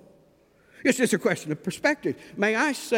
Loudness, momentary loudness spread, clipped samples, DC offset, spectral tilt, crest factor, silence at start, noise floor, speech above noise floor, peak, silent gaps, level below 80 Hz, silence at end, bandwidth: -25 LUFS; 7 LU; under 0.1%; under 0.1%; -4 dB/octave; 20 dB; 0.8 s; -60 dBFS; 35 dB; -6 dBFS; none; -68 dBFS; 0 s; 17 kHz